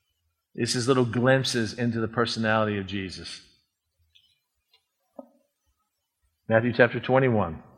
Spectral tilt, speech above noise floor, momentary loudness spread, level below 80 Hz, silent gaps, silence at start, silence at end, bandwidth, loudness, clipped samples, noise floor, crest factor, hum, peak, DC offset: -5 dB/octave; 54 dB; 15 LU; -60 dBFS; none; 0.55 s; 0.15 s; 13.5 kHz; -24 LUFS; under 0.1%; -79 dBFS; 24 dB; none; -2 dBFS; under 0.1%